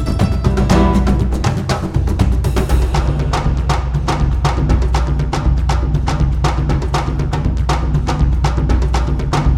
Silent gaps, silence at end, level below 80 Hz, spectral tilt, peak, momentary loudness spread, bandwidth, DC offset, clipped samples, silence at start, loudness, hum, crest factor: none; 0 s; -16 dBFS; -6.5 dB/octave; 0 dBFS; 4 LU; 11.5 kHz; under 0.1%; under 0.1%; 0 s; -16 LUFS; none; 14 dB